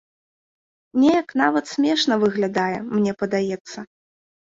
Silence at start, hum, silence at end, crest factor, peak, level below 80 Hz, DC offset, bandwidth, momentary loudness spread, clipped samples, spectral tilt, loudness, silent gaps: 0.95 s; none; 0.65 s; 18 dB; -4 dBFS; -64 dBFS; under 0.1%; 7.8 kHz; 9 LU; under 0.1%; -5 dB/octave; -21 LUFS; 3.61-3.65 s